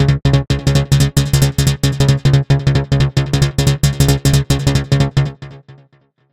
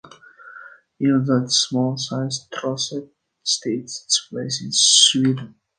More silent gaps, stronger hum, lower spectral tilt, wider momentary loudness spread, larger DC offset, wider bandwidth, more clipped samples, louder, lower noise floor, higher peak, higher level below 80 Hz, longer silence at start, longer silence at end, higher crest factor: neither; neither; first, -5.5 dB/octave vs -3 dB/octave; second, 2 LU vs 14 LU; first, 0.4% vs under 0.1%; first, 16 kHz vs 10 kHz; neither; first, -14 LUFS vs -19 LUFS; first, -53 dBFS vs -44 dBFS; about the same, 0 dBFS vs 0 dBFS; first, -26 dBFS vs -66 dBFS; about the same, 0 s vs 0.05 s; first, 0.6 s vs 0.3 s; second, 14 dB vs 20 dB